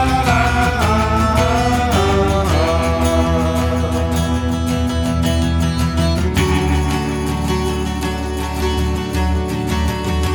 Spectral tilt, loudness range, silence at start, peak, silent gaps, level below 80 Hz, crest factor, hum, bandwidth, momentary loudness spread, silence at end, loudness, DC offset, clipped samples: -6 dB/octave; 4 LU; 0 s; -2 dBFS; none; -22 dBFS; 14 dB; none; 19 kHz; 5 LU; 0 s; -17 LUFS; under 0.1%; under 0.1%